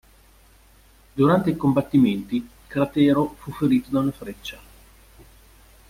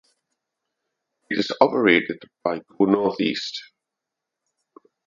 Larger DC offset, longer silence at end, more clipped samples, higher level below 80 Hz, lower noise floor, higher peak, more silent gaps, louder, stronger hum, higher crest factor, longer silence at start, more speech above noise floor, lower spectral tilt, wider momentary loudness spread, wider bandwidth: neither; about the same, 1.35 s vs 1.4 s; neither; first, -52 dBFS vs -68 dBFS; second, -53 dBFS vs -85 dBFS; second, -4 dBFS vs 0 dBFS; neither; about the same, -22 LUFS vs -22 LUFS; neither; second, 18 dB vs 24 dB; second, 1.15 s vs 1.3 s; second, 32 dB vs 63 dB; first, -8 dB/octave vs -5.5 dB/octave; first, 16 LU vs 12 LU; first, 16 kHz vs 7.4 kHz